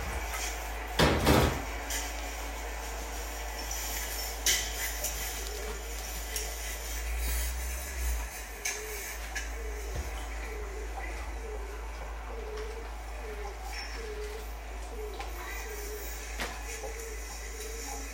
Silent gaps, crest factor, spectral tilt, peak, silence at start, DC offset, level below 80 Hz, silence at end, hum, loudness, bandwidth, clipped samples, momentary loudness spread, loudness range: none; 26 dB; -3 dB/octave; -10 dBFS; 0 s; under 0.1%; -38 dBFS; 0 s; none; -35 LUFS; 16.5 kHz; under 0.1%; 13 LU; 9 LU